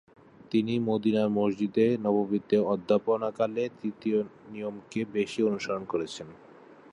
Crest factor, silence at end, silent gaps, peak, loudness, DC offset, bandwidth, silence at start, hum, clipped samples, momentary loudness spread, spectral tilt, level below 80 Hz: 18 dB; 0.2 s; none; -10 dBFS; -28 LUFS; under 0.1%; 10.5 kHz; 0.5 s; none; under 0.1%; 12 LU; -7 dB/octave; -68 dBFS